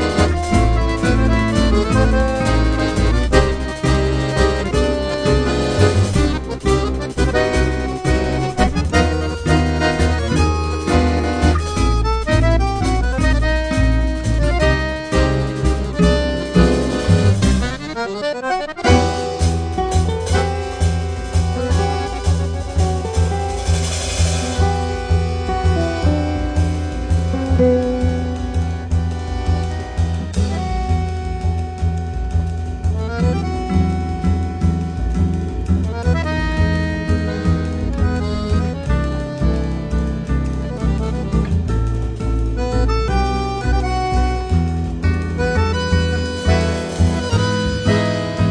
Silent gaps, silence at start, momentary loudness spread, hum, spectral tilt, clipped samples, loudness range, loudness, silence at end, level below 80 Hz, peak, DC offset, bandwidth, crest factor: none; 0 s; 6 LU; none; -6 dB/octave; under 0.1%; 4 LU; -18 LUFS; 0 s; -22 dBFS; 0 dBFS; under 0.1%; 10 kHz; 16 dB